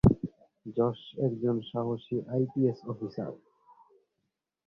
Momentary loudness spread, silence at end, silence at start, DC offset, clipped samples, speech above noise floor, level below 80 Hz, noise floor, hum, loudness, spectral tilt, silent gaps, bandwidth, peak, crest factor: 12 LU; 1.3 s; 0.05 s; under 0.1%; under 0.1%; 52 dB; -48 dBFS; -83 dBFS; none; -32 LUFS; -10.5 dB/octave; none; 6.6 kHz; -8 dBFS; 22 dB